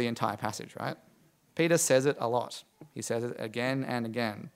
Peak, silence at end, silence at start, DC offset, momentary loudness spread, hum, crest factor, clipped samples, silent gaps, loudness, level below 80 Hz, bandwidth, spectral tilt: -12 dBFS; 0.05 s; 0 s; under 0.1%; 16 LU; none; 20 dB; under 0.1%; none; -31 LUFS; -76 dBFS; 16 kHz; -4 dB/octave